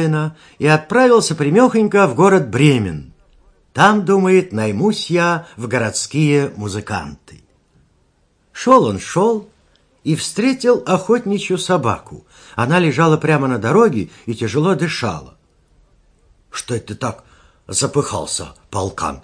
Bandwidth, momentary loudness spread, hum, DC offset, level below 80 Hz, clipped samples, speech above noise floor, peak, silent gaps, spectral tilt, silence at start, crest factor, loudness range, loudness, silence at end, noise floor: 10.5 kHz; 13 LU; none; under 0.1%; -50 dBFS; under 0.1%; 43 dB; 0 dBFS; none; -5.5 dB/octave; 0 s; 16 dB; 9 LU; -16 LUFS; 0.05 s; -59 dBFS